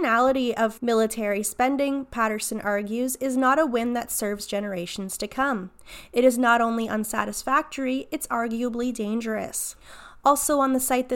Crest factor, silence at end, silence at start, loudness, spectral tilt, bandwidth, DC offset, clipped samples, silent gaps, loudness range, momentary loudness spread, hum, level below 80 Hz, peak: 18 dB; 0 s; 0 s; -24 LUFS; -3.5 dB/octave; 17 kHz; under 0.1%; under 0.1%; none; 2 LU; 9 LU; none; -54 dBFS; -6 dBFS